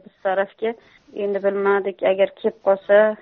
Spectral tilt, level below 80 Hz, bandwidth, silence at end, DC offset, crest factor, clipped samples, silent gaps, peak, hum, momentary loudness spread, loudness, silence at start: -3.5 dB/octave; -68 dBFS; 4.1 kHz; 0.05 s; under 0.1%; 16 dB; under 0.1%; none; -4 dBFS; none; 12 LU; -21 LUFS; 0.25 s